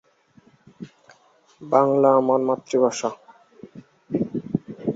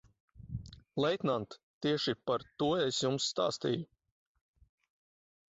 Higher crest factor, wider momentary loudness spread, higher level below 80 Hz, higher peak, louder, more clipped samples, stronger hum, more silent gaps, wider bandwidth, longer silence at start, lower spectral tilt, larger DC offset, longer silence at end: about the same, 20 dB vs 18 dB; first, 26 LU vs 14 LU; about the same, -66 dBFS vs -62 dBFS; first, -4 dBFS vs -18 dBFS; first, -21 LUFS vs -34 LUFS; neither; neither; second, none vs 1.63-1.81 s; about the same, 8 kHz vs 8 kHz; first, 0.8 s vs 0.35 s; first, -6.5 dB/octave vs -4 dB/octave; neither; second, 0 s vs 1.65 s